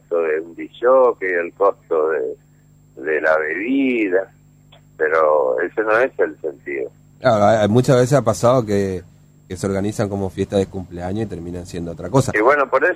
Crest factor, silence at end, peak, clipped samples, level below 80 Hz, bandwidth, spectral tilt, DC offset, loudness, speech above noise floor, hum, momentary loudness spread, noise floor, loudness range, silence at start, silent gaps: 18 dB; 0 s; -2 dBFS; under 0.1%; -50 dBFS; 14.5 kHz; -6.5 dB/octave; under 0.1%; -18 LUFS; 33 dB; 50 Hz at -50 dBFS; 14 LU; -50 dBFS; 4 LU; 0.1 s; none